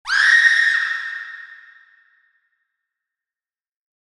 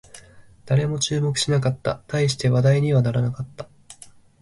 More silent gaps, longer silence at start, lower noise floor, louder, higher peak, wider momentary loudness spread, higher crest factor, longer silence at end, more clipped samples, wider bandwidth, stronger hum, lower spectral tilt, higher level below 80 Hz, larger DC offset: neither; about the same, 0.05 s vs 0.15 s; first, under -90 dBFS vs -47 dBFS; first, -14 LUFS vs -21 LUFS; first, 0 dBFS vs -8 dBFS; first, 22 LU vs 14 LU; about the same, 20 dB vs 16 dB; first, 2.5 s vs 0.5 s; neither; about the same, 12 kHz vs 11.5 kHz; neither; second, 4.5 dB/octave vs -5.5 dB/octave; second, -68 dBFS vs -52 dBFS; neither